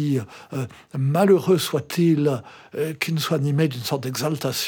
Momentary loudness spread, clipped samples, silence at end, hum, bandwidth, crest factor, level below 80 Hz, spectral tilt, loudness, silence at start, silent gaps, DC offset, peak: 14 LU; under 0.1%; 0 s; none; 20 kHz; 18 dB; -68 dBFS; -6 dB/octave; -22 LUFS; 0 s; none; under 0.1%; -4 dBFS